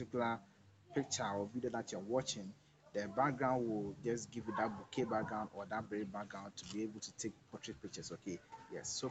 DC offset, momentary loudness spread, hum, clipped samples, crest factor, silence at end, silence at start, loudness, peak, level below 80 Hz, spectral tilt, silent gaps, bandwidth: under 0.1%; 11 LU; none; under 0.1%; 20 dB; 0 s; 0 s; -42 LUFS; -20 dBFS; -72 dBFS; -4.5 dB/octave; none; 8.8 kHz